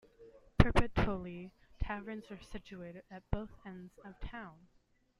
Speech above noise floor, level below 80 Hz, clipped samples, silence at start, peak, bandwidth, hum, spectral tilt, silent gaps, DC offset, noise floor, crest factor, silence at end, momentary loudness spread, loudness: 22 dB; -42 dBFS; under 0.1%; 0.2 s; -6 dBFS; 11.5 kHz; none; -7.5 dB/octave; none; under 0.1%; -60 dBFS; 30 dB; 0.65 s; 21 LU; -37 LUFS